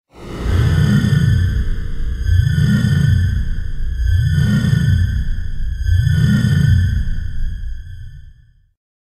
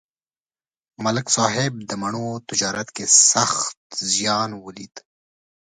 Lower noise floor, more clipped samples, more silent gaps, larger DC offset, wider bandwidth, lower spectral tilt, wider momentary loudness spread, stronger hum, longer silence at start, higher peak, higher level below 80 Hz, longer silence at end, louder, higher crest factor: second, -45 dBFS vs under -90 dBFS; neither; second, none vs 3.77-3.90 s; neither; first, 13.5 kHz vs 11 kHz; first, -7 dB/octave vs -2 dB/octave; second, 13 LU vs 16 LU; neither; second, 0.15 s vs 1 s; about the same, -2 dBFS vs 0 dBFS; first, -22 dBFS vs -62 dBFS; about the same, 0.8 s vs 0.75 s; about the same, -17 LUFS vs -19 LUFS; second, 14 dB vs 24 dB